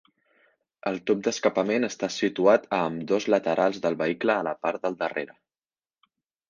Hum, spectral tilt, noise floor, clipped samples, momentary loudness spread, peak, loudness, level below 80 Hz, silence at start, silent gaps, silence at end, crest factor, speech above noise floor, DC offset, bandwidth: none; -4.5 dB/octave; under -90 dBFS; under 0.1%; 9 LU; -6 dBFS; -26 LUFS; -70 dBFS; 0.85 s; none; 1.25 s; 20 dB; over 65 dB; under 0.1%; 7.4 kHz